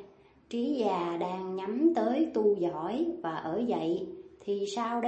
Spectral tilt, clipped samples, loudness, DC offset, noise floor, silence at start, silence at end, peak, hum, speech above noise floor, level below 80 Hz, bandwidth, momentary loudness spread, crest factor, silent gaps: -6.5 dB/octave; under 0.1%; -31 LUFS; under 0.1%; -56 dBFS; 0 s; 0 s; -14 dBFS; none; 26 dB; -70 dBFS; 8.6 kHz; 8 LU; 16 dB; none